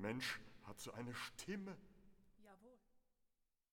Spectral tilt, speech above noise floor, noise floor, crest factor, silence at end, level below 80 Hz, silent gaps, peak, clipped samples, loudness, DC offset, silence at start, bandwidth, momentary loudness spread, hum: -4 dB/octave; 36 dB; -85 dBFS; 20 dB; 0.75 s; -74 dBFS; none; -32 dBFS; under 0.1%; -49 LUFS; under 0.1%; 0 s; 19 kHz; 21 LU; none